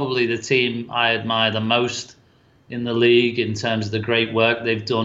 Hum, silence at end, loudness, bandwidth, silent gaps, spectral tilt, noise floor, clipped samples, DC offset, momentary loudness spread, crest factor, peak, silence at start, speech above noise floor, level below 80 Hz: none; 0 s; -20 LUFS; 7.8 kHz; none; -5 dB/octave; -55 dBFS; under 0.1%; under 0.1%; 9 LU; 16 dB; -4 dBFS; 0 s; 35 dB; -60 dBFS